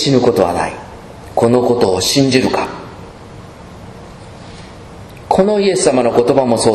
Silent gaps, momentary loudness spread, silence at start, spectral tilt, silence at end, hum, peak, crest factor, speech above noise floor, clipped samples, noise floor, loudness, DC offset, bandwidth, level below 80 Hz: none; 23 LU; 0 s; -4.5 dB/octave; 0 s; none; 0 dBFS; 14 dB; 22 dB; 0.1%; -34 dBFS; -13 LUFS; under 0.1%; 13.5 kHz; -42 dBFS